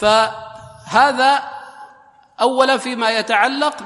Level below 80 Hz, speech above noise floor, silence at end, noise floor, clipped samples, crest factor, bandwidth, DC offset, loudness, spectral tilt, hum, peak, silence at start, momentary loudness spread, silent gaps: -56 dBFS; 33 dB; 0 s; -48 dBFS; under 0.1%; 18 dB; 11.5 kHz; under 0.1%; -16 LUFS; -2.5 dB/octave; none; 0 dBFS; 0 s; 19 LU; none